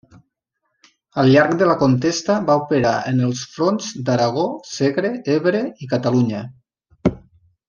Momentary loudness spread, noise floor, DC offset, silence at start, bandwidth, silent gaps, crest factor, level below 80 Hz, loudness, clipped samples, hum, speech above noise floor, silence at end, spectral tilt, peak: 9 LU; -74 dBFS; under 0.1%; 1.15 s; 7.4 kHz; none; 18 dB; -52 dBFS; -19 LUFS; under 0.1%; none; 56 dB; 0.5 s; -6 dB/octave; -2 dBFS